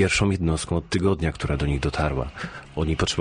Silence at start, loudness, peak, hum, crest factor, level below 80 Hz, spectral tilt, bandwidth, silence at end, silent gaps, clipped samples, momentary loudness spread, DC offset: 0 s; -25 LUFS; -8 dBFS; none; 16 dB; -34 dBFS; -5.5 dB/octave; 10 kHz; 0 s; none; under 0.1%; 8 LU; under 0.1%